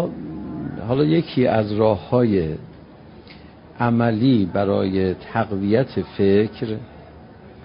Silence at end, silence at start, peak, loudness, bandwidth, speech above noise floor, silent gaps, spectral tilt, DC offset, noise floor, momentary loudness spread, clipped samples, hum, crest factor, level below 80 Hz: 0 s; 0 s; -4 dBFS; -20 LUFS; 5.4 kHz; 24 dB; none; -12.5 dB/octave; under 0.1%; -43 dBFS; 12 LU; under 0.1%; none; 16 dB; -44 dBFS